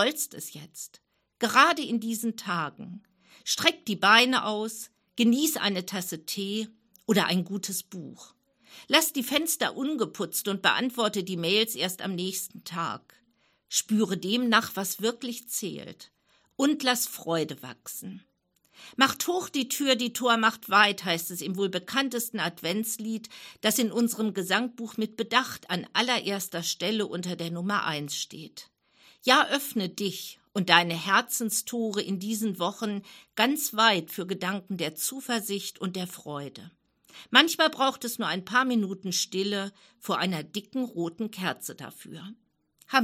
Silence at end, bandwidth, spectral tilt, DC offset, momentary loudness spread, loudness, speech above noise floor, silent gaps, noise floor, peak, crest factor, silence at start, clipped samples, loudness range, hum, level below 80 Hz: 0 s; 16.5 kHz; -3 dB/octave; under 0.1%; 17 LU; -27 LUFS; 41 dB; none; -69 dBFS; -2 dBFS; 28 dB; 0 s; under 0.1%; 5 LU; none; -78 dBFS